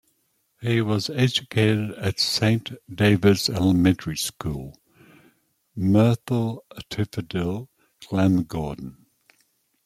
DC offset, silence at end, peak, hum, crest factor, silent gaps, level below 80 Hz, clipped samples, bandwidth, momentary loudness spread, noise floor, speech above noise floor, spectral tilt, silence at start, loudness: under 0.1%; 0.95 s; -4 dBFS; none; 20 dB; none; -52 dBFS; under 0.1%; 15.5 kHz; 15 LU; -69 dBFS; 47 dB; -5.5 dB/octave; 0.6 s; -23 LUFS